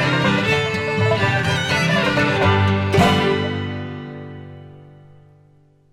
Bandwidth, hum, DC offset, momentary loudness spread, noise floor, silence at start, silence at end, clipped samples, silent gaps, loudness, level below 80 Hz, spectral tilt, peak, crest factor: 15 kHz; none; under 0.1%; 17 LU; -53 dBFS; 0 s; 1 s; under 0.1%; none; -18 LUFS; -46 dBFS; -5.5 dB/octave; -4 dBFS; 16 dB